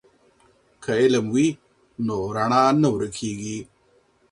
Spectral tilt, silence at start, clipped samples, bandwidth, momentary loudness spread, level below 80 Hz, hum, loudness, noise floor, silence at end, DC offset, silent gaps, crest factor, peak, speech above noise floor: -5.5 dB/octave; 0.8 s; under 0.1%; 11.5 kHz; 15 LU; -56 dBFS; none; -22 LUFS; -61 dBFS; 0.65 s; under 0.1%; none; 20 dB; -4 dBFS; 40 dB